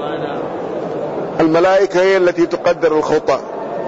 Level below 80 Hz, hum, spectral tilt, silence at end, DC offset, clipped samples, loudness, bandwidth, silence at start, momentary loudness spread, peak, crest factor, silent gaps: -50 dBFS; none; -5.5 dB/octave; 0 s; under 0.1%; under 0.1%; -16 LUFS; 8 kHz; 0 s; 11 LU; -6 dBFS; 10 dB; none